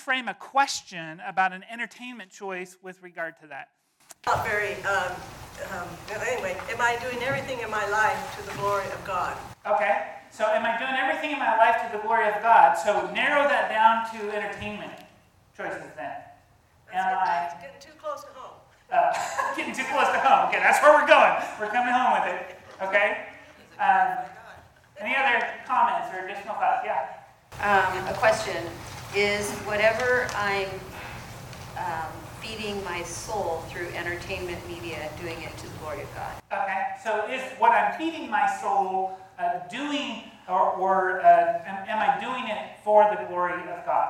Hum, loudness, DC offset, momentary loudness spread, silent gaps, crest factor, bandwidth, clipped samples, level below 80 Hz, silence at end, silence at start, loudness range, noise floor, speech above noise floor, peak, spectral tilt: none; -25 LUFS; under 0.1%; 17 LU; none; 24 dB; 18 kHz; under 0.1%; -58 dBFS; 0 s; 0 s; 11 LU; -59 dBFS; 34 dB; -2 dBFS; -3.5 dB/octave